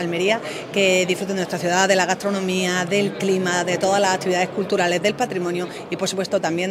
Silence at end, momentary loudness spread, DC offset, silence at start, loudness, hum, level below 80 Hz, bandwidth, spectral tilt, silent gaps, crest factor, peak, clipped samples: 0 s; 7 LU; under 0.1%; 0 s; -20 LUFS; none; -64 dBFS; 16 kHz; -4 dB/octave; none; 20 dB; -2 dBFS; under 0.1%